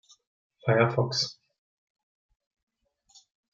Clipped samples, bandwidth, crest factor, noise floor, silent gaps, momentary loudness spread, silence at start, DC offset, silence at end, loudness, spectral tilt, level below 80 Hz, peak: under 0.1%; 7.6 kHz; 22 dB; -62 dBFS; none; 9 LU; 0.65 s; under 0.1%; 2.2 s; -26 LUFS; -5 dB/octave; -72 dBFS; -10 dBFS